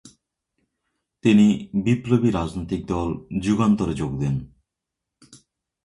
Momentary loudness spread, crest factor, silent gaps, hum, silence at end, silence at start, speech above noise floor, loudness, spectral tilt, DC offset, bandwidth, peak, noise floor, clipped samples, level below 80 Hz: 10 LU; 18 dB; none; none; 0.5 s; 0.05 s; 64 dB; -22 LUFS; -7.5 dB/octave; under 0.1%; 11 kHz; -6 dBFS; -84 dBFS; under 0.1%; -44 dBFS